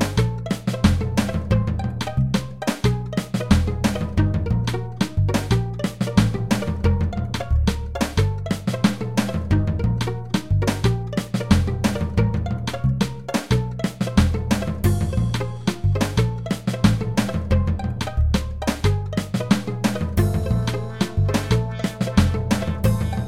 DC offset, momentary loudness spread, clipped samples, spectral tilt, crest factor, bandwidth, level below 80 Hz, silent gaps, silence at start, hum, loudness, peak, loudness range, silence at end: 0.9%; 6 LU; under 0.1%; -6.5 dB/octave; 20 dB; 16.5 kHz; -30 dBFS; none; 0 s; none; -22 LUFS; -2 dBFS; 1 LU; 0 s